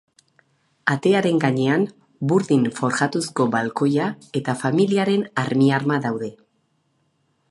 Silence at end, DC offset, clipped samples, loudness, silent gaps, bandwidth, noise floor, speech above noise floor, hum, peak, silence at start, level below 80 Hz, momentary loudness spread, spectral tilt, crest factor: 1.15 s; under 0.1%; under 0.1%; -21 LUFS; none; 11.5 kHz; -67 dBFS; 47 dB; none; -2 dBFS; 0.85 s; -66 dBFS; 8 LU; -6 dB/octave; 20 dB